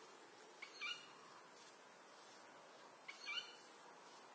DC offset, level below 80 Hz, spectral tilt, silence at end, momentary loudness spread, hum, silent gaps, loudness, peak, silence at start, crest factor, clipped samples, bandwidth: under 0.1%; under -90 dBFS; 0 dB/octave; 0 s; 14 LU; none; none; -54 LUFS; -34 dBFS; 0 s; 22 dB; under 0.1%; 8 kHz